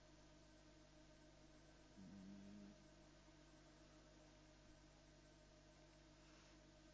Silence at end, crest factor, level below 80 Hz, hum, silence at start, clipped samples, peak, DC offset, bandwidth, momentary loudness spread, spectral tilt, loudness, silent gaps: 0 s; 16 dB; -74 dBFS; 50 Hz at -70 dBFS; 0 s; under 0.1%; -50 dBFS; under 0.1%; 8 kHz; 7 LU; -4.5 dB/octave; -67 LUFS; none